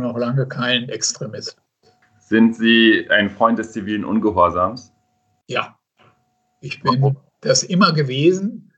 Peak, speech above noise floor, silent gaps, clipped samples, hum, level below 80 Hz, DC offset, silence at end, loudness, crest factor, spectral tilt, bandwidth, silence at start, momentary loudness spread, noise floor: 0 dBFS; 48 dB; none; under 0.1%; none; -56 dBFS; under 0.1%; 0.2 s; -17 LUFS; 18 dB; -4.5 dB/octave; 8.6 kHz; 0 s; 15 LU; -66 dBFS